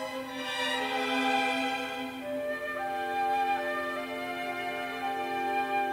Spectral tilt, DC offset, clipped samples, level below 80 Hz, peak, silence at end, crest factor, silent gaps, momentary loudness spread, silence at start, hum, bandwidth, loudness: -2.5 dB/octave; under 0.1%; under 0.1%; -68 dBFS; -16 dBFS; 0 s; 14 dB; none; 8 LU; 0 s; none; 16 kHz; -31 LUFS